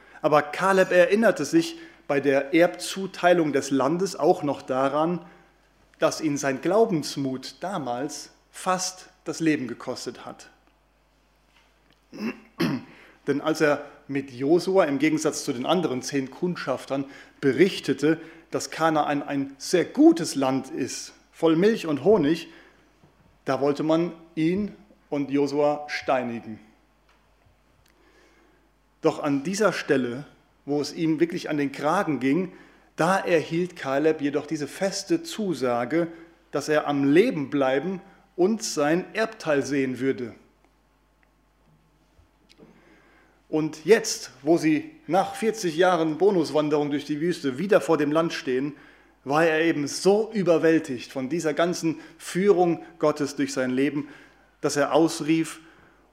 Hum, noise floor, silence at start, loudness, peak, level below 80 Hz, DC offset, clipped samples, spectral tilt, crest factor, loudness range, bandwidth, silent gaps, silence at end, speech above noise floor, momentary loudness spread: none; -63 dBFS; 0.15 s; -24 LUFS; -4 dBFS; -66 dBFS; under 0.1%; under 0.1%; -5 dB/octave; 20 dB; 7 LU; 15.5 kHz; none; 0.5 s; 40 dB; 12 LU